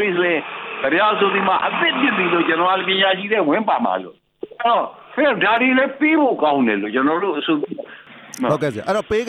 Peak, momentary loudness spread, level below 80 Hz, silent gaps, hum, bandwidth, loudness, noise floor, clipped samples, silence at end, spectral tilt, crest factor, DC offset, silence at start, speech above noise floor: -4 dBFS; 10 LU; -58 dBFS; none; none; 12.5 kHz; -18 LUFS; -40 dBFS; under 0.1%; 0 s; -5 dB/octave; 14 dB; under 0.1%; 0 s; 23 dB